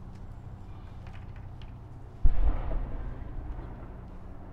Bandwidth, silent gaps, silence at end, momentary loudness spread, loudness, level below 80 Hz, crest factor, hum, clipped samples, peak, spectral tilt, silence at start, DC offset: 3.6 kHz; none; 0 s; 14 LU; -39 LUFS; -32 dBFS; 22 dB; none; under 0.1%; -8 dBFS; -9 dB/octave; 0 s; under 0.1%